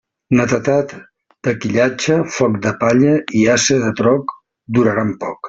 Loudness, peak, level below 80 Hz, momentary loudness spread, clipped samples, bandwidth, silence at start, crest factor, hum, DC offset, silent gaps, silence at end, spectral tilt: -16 LUFS; -2 dBFS; -52 dBFS; 8 LU; under 0.1%; 7.8 kHz; 0.3 s; 14 dB; none; under 0.1%; none; 0 s; -5 dB/octave